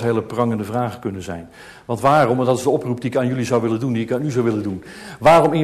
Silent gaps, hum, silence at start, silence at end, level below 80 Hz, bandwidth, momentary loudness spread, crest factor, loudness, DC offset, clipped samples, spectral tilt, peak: none; none; 0 s; 0 s; -52 dBFS; 13.5 kHz; 17 LU; 14 dB; -19 LUFS; under 0.1%; under 0.1%; -6.5 dB/octave; -4 dBFS